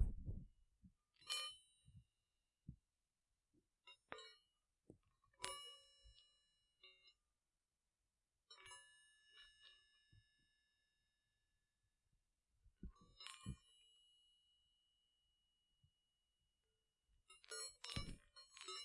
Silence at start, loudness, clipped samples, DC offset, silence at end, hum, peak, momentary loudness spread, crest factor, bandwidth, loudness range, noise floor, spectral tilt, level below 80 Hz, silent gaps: 0 s; -53 LUFS; under 0.1%; under 0.1%; 0 s; none; -22 dBFS; 20 LU; 36 dB; 11.5 kHz; 12 LU; under -90 dBFS; -2.5 dB/octave; -64 dBFS; none